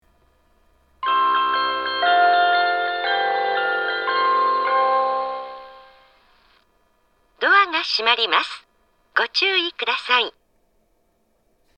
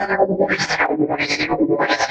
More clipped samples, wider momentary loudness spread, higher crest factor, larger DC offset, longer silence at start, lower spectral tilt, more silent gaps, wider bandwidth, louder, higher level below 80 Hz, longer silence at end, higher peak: neither; first, 10 LU vs 2 LU; first, 22 dB vs 16 dB; neither; first, 1 s vs 0 s; second, -1.5 dB/octave vs -4 dB/octave; neither; about the same, 8.8 kHz vs 9 kHz; about the same, -19 LUFS vs -18 LUFS; second, -64 dBFS vs -50 dBFS; first, 1.45 s vs 0 s; first, 0 dBFS vs -4 dBFS